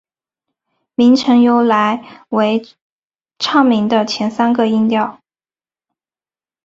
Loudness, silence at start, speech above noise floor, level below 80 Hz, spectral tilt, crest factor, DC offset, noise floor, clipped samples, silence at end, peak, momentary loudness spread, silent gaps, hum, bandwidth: -14 LUFS; 1 s; over 77 dB; -60 dBFS; -5.5 dB/octave; 14 dB; under 0.1%; under -90 dBFS; under 0.1%; 1.55 s; -2 dBFS; 11 LU; 2.82-3.08 s; none; 7.8 kHz